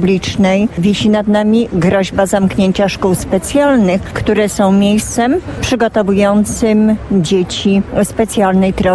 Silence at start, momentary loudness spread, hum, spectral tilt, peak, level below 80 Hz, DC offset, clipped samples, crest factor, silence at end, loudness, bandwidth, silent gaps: 0 s; 3 LU; none; -5.5 dB/octave; 0 dBFS; -34 dBFS; 0.1%; under 0.1%; 12 dB; 0 s; -12 LUFS; 11 kHz; none